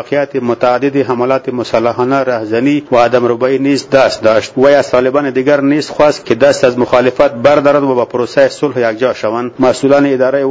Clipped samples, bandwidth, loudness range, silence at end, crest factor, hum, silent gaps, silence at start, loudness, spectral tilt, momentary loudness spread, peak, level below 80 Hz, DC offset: 0.5%; 8 kHz; 2 LU; 0 s; 10 dB; none; none; 0 s; -11 LUFS; -5.5 dB/octave; 5 LU; 0 dBFS; -48 dBFS; under 0.1%